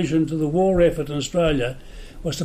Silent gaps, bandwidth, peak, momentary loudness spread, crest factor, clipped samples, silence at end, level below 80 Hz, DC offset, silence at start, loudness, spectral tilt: none; 15.5 kHz; -8 dBFS; 12 LU; 14 dB; under 0.1%; 0 s; -36 dBFS; under 0.1%; 0 s; -21 LUFS; -6 dB/octave